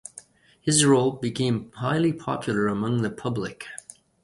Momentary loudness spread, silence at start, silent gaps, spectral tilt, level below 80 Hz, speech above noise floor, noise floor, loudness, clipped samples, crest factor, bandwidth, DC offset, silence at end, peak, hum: 17 LU; 0.15 s; none; -4.5 dB/octave; -58 dBFS; 26 dB; -50 dBFS; -24 LUFS; under 0.1%; 22 dB; 11.5 kHz; under 0.1%; 0.45 s; -4 dBFS; none